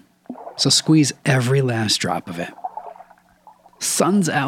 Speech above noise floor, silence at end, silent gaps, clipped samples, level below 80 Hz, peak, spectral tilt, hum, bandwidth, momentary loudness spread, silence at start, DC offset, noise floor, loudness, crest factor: 32 dB; 0 s; none; under 0.1%; -68 dBFS; -4 dBFS; -4 dB/octave; none; 17 kHz; 20 LU; 0.3 s; under 0.1%; -51 dBFS; -18 LUFS; 18 dB